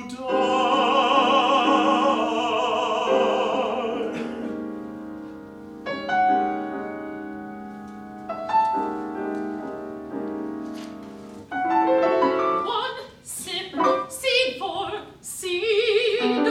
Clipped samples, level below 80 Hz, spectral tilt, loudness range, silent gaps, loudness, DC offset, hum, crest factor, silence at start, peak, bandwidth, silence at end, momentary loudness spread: under 0.1%; -62 dBFS; -3.5 dB/octave; 8 LU; none; -23 LUFS; under 0.1%; none; 18 dB; 0 s; -6 dBFS; 16 kHz; 0 s; 17 LU